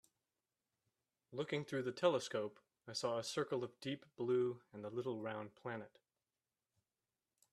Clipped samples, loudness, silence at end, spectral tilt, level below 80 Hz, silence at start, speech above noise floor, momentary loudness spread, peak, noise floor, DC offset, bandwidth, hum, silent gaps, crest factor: under 0.1%; -42 LUFS; 1.65 s; -5 dB/octave; -86 dBFS; 1.3 s; over 48 dB; 12 LU; -20 dBFS; under -90 dBFS; under 0.1%; 13 kHz; none; none; 24 dB